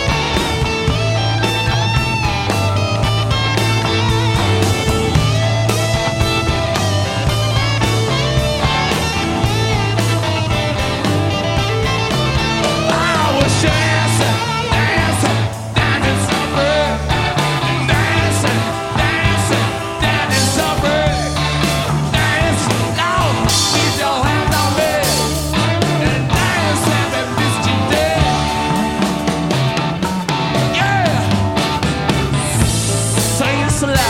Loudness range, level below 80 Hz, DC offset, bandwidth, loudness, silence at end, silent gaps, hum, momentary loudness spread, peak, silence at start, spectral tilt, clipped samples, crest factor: 2 LU; -28 dBFS; under 0.1%; 16.5 kHz; -15 LUFS; 0 s; none; none; 3 LU; 0 dBFS; 0 s; -4.5 dB/octave; under 0.1%; 14 dB